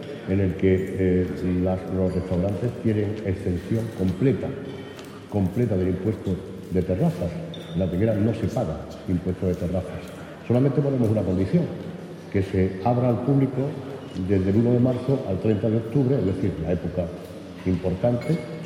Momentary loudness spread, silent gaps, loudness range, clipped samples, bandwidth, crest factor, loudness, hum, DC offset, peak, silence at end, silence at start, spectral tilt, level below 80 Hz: 11 LU; none; 3 LU; under 0.1%; 15 kHz; 16 dB; -24 LUFS; none; under 0.1%; -8 dBFS; 0 s; 0 s; -9 dB/octave; -48 dBFS